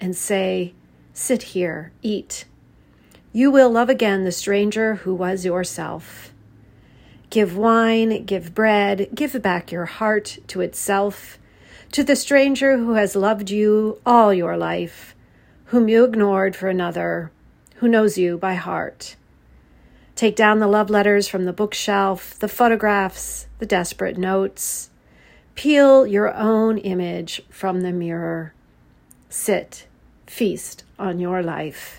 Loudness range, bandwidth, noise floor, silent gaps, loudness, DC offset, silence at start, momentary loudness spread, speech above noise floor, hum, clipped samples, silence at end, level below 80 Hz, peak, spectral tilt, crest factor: 6 LU; 16.5 kHz; -54 dBFS; none; -19 LUFS; under 0.1%; 0 s; 14 LU; 35 dB; none; under 0.1%; 0 s; -54 dBFS; 0 dBFS; -4.5 dB/octave; 20 dB